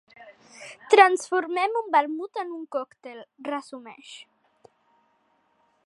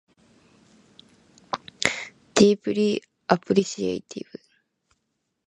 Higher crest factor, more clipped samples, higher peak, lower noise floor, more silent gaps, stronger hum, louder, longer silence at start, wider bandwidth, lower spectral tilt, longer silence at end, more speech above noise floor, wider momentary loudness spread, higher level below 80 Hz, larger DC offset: about the same, 26 dB vs 26 dB; neither; about the same, -2 dBFS vs 0 dBFS; second, -68 dBFS vs -77 dBFS; neither; neither; about the same, -23 LUFS vs -24 LUFS; second, 0.2 s vs 1.55 s; about the same, 11.5 kHz vs 11.5 kHz; second, -1.5 dB/octave vs -4.5 dB/octave; first, 1.7 s vs 1.25 s; second, 43 dB vs 55 dB; first, 26 LU vs 19 LU; second, -86 dBFS vs -62 dBFS; neither